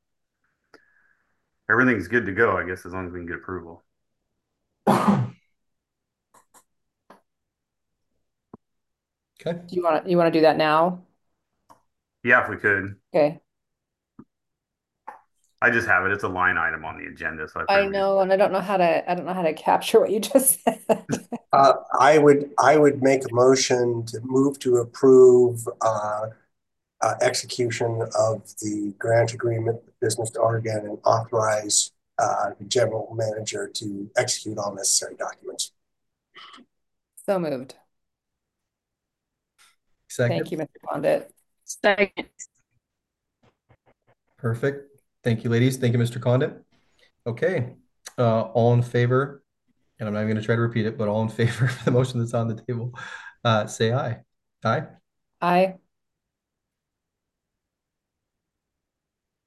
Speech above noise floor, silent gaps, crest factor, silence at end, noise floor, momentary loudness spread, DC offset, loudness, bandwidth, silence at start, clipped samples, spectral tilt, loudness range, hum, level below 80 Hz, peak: 63 dB; none; 20 dB; 3.7 s; -84 dBFS; 14 LU; under 0.1%; -22 LUFS; 13 kHz; 1.7 s; under 0.1%; -5 dB/octave; 11 LU; none; -58 dBFS; -4 dBFS